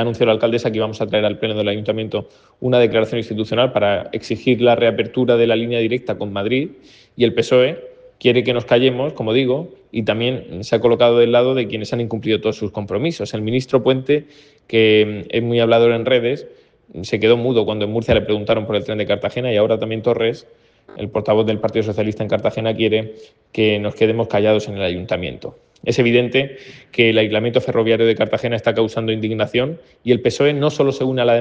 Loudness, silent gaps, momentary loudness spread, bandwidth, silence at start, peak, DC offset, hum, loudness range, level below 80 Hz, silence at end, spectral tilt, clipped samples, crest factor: -18 LUFS; none; 9 LU; 8 kHz; 0 s; 0 dBFS; under 0.1%; none; 3 LU; -50 dBFS; 0 s; -6.5 dB/octave; under 0.1%; 18 dB